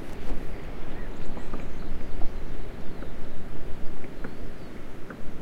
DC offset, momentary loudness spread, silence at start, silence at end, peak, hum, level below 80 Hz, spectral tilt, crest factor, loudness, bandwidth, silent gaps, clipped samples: under 0.1%; 4 LU; 0 s; 0 s; -8 dBFS; none; -32 dBFS; -7 dB/octave; 14 dB; -40 LUFS; 4.6 kHz; none; under 0.1%